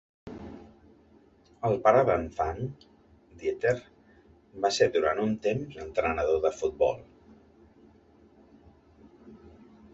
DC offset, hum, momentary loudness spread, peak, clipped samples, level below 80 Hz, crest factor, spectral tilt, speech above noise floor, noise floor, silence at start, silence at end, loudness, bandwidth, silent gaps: under 0.1%; none; 20 LU; -8 dBFS; under 0.1%; -54 dBFS; 22 dB; -5.5 dB/octave; 32 dB; -59 dBFS; 0.25 s; 0.45 s; -28 LUFS; 8.2 kHz; none